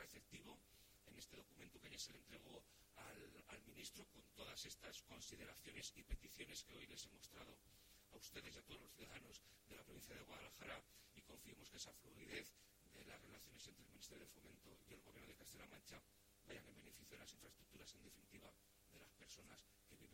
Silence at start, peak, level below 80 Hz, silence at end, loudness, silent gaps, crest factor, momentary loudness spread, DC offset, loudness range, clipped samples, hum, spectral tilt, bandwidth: 0 s; -36 dBFS; -70 dBFS; 0 s; -60 LUFS; none; 24 dB; 11 LU; under 0.1%; 6 LU; under 0.1%; none; -2.5 dB/octave; 16.5 kHz